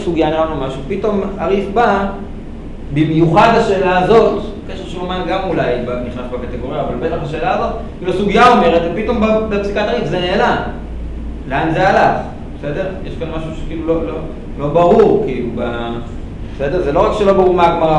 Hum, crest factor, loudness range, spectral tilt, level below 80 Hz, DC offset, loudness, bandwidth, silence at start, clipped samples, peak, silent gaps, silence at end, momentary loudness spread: none; 14 dB; 4 LU; -7 dB/octave; -28 dBFS; under 0.1%; -15 LUFS; 10.5 kHz; 0 s; under 0.1%; 0 dBFS; none; 0 s; 16 LU